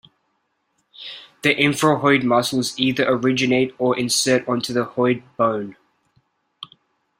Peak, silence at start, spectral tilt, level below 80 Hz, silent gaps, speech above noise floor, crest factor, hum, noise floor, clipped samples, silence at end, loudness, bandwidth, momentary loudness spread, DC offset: -2 dBFS; 1 s; -4 dB/octave; -60 dBFS; none; 51 dB; 18 dB; none; -70 dBFS; under 0.1%; 0.55 s; -19 LUFS; 16 kHz; 19 LU; under 0.1%